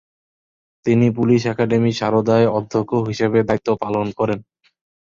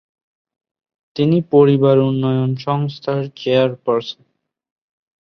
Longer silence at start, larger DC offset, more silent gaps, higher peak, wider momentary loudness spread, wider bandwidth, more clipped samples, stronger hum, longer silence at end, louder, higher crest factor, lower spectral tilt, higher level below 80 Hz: second, 0.85 s vs 1.15 s; neither; neither; about the same, -4 dBFS vs -2 dBFS; second, 6 LU vs 10 LU; first, 7.4 kHz vs 6.4 kHz; neither; neither; second, 0.6 s vs 1.1 s; about the same, -18 LUFS vs -17 LUFS; about the same, 16 dB vs 16 dB; second, -7.5 dB/octave vs -9 dB/octave; first, -52 dBFS vs -60 dBFS